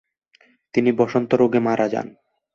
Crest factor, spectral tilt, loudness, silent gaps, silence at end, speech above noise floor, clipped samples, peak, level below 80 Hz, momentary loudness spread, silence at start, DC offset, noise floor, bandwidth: 18 dB; -7.5 dB/octave; -20 LUFS; none; 0.5 s; 40 dB; under 0.1%; -4 dBFS; -62 dBFS; 9 LU; 0.75 s; under 0.1%; -59 dBFS; 7.2 kHz